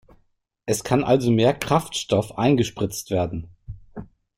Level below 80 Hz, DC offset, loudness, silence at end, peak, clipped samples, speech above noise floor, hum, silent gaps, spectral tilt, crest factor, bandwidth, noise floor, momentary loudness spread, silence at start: -48 dBFS; under 0.1%; -22 LUFS; 0.3 s; -4 dBFS; under 0.1%; 44 dB; none; none; -5.5 dB/octave; 18 dB; 16.5 kHz; -65 dBFS; 21 LU; 0.65 s